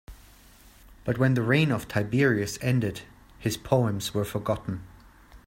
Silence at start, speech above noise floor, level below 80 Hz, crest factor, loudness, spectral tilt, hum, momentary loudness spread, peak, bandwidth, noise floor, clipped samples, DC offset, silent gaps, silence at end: 0.1 s; 28 dB; -52 dBFS; 20 dB; -26 LUFS; -6 dB/octave; none; 11 LU; -6 dBFS; 16.5 kHz; -53 dBFS; under 0.1%; under 0.1%; none; 0.1 s